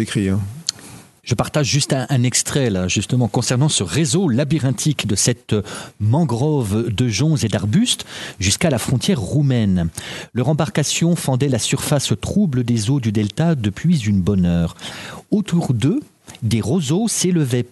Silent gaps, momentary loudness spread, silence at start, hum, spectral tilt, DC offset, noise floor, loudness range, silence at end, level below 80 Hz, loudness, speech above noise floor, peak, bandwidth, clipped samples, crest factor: none; 7 LU; 0 s; none; -5 dB/octave; under 0.1%; -41 dBFS; 2 LU; 0.05 s; -44 dBFS; -18 LUFS; 23 dB; 0 dBFS; 12.5 kHz; under 0.1%; 18 dB